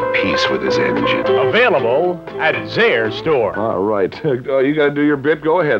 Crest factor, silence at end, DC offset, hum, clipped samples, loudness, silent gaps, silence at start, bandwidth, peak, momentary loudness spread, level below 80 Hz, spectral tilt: 12 dB; 0 s; under 0.1%; none; under 0.1%; -16 LUFS; none; 0 s; 7.8 kHz; -4 dBFS; 5 LU; -50 dBFS; -6 dB/octave